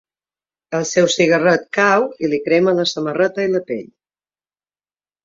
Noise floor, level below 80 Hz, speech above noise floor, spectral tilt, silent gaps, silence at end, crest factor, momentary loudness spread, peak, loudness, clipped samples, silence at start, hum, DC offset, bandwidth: under -90 dBFS; -62 dBFS; over 74 dB; -4 dB/octave; none; 1.4 s; 16 dB; 9 LU; -2 dBFS; -16 LUFS; under 0.1%; 0.7 s; 50 Hz at -55 dBFS; under 0.1%; 7.8 kHz